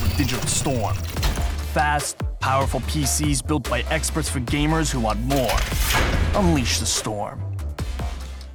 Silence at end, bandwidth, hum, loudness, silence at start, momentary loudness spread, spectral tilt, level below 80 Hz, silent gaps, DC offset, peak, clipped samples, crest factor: 0 s; over 20 kHz; none; -22 LUFS; 0 s; 9 LU; -4 dB/octave; -28 dBFS; none; under 0.1%; -6 dBFS; under 0.1%; 16 dB